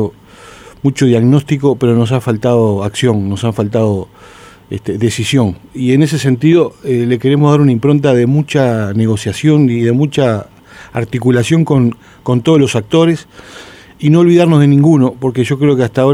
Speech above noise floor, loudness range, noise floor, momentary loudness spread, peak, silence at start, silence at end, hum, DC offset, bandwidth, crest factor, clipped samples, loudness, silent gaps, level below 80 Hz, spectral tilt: 26 dB; 4 LU; -37 dBFS; 9 LU; 0 dBFS; 0 s; 0 s; none; under 0.1%; 13.5 kHz; 12 dB; under 0.1%; -12 LUFS; none; -46 dBFS; -7 dB/octave